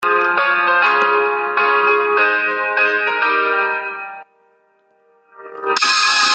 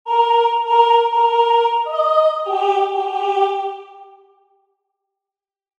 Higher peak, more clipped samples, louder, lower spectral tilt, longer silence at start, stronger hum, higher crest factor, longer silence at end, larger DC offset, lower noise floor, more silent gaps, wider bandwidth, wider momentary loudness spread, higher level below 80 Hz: about the same, -2 dBFS vs -2 dBFS; neither; about the same, -15 LUFS vs -16 LUFS; about the same, 0 dB/octave vs -1 dB/octave; about the same, 0 s vs 0.05 s; neither; about the same, 16 dB vs 16 dB; second, 0 s vs 1.75 s; neither; second, -58 dBFS vs -88 dBFS; neither; first, 9.2 kHz vs 8.2 kHz; first, 10 LU vs 6 LU; first, -72 dBFS vs under -90 dBFS